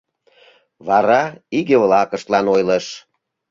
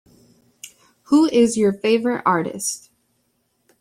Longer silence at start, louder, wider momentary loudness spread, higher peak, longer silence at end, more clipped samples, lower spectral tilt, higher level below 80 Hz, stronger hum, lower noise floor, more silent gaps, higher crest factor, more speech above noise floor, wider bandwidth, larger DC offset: first, 0.85 s vs 0.65 s; first, -16 LUFS vs -19 LUFS; second, 14 LU vs 25 LU; about the same, -2 dBFS vs -4 dBFS; second, 0.5 s vs 1.05 s; neither; about the same, -5.5 dB/octave vs -4.5 dB/octave; about the same, -60 dBFS vs -62 dBFS; neither; second, -52 dBFS vs -68 dBFS; neither; about the same, 16 dB vs 16 dB; second, 36 dB vs 50 dB; second, 7.6 kHz vs 16 kHz; neither